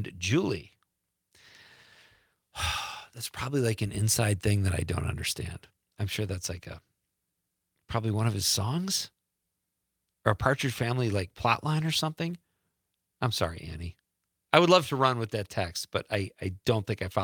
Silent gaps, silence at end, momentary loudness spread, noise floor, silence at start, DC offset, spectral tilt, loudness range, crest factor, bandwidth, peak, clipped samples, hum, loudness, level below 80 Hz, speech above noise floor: none; 0 s; 13 LU; -83 dBFS; 0 s; under 0.1%; -4.5 dB/octave; 7 LU; 28 dB; 19.5 kHz; -2 dBFS; under 0.1%; none; -29 LUFS; -54 dBFS; 54 dB